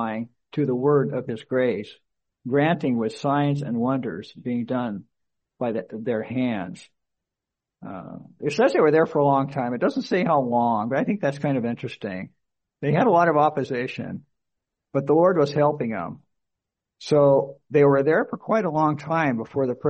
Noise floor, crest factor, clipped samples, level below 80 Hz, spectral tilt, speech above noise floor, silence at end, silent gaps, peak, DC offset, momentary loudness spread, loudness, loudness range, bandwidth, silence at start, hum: -86 dBFS; 18 dB; under 0.1%; -66 dBFS; -7.5 dB/octave; 64 dB; 0 s; none; -6 dBFS; under 0.1%; 15 LU; -23 LUFS; 7 LU; 8.4 kHz; 0 s; none